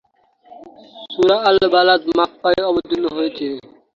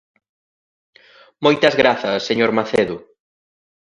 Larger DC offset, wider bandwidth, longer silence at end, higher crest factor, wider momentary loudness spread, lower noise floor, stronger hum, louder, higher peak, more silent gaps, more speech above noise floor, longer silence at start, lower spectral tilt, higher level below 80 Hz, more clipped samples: neither; second, 7.2 kHz vs 11 kHz; second, 0.35 s vs 1 s; about the same, 16 dB vs 20 dB; first, 13 LU vs 7 LU; second, -52 dBFS vs under -90 dBFS; neither; about the same, -16 LUFS vs -17 LUFS; about the same, -2 dBFS vs 0 dBFS; neither; second, 36 dB vs over 73 dB; second, 0.5 s vs 1.4 s; about the same, -5 dB/octave vs -5 dB/octave; about the same, -54 dBFS vs -58 dBFS; neither